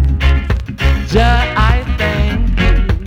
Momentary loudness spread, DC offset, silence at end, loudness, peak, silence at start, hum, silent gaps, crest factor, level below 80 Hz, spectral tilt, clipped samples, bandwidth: 4 LU; under 0.1%; 0 s; -14 LUFS; -2 dBFS; 0 s; none; none; 10 dB; -14 dBFS; -6.5 dB/octave; under 0.1%; 8.2 kHz